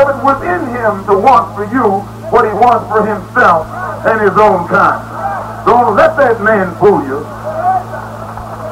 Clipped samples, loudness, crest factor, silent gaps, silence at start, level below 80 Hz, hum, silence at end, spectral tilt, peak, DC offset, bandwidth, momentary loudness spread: under 0.1%; -11 LUFS; 12 dB; none; 0 s; -38 dBFS; none; 0 s; -7 dB/octave; 0 dBFS; under 0.1%; 16 kHz; 12 LU